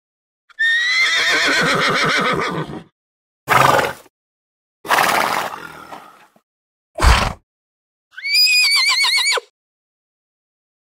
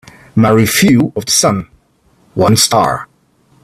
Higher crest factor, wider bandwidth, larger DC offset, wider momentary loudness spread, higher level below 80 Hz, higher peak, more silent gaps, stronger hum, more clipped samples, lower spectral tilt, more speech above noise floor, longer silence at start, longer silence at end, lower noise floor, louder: about the same, 18 dB vs 14 dB; about the same, 16.5 kHz vs 16 kHz; neither; first, 16 LU vs 11 LU; first, -30 dBFS vs -44 dBFS; about the same, 0 dBFS vs 0 dBFS; first, 2.92-3.47 s, 4.10-4.84 s, 6.43-6.94 s, 7.43-8.11 s vs none; neither; neither; second, -2 dB/octave vs -4 dB/octave; second, 22 dB vs 42 dB; first, 0.6 s vs 0.35 s; first, 1.5 s vs 0.6 s; second, -40 dBFS vs -53 dBFS; second, -15 LUFS vs -11 LUFS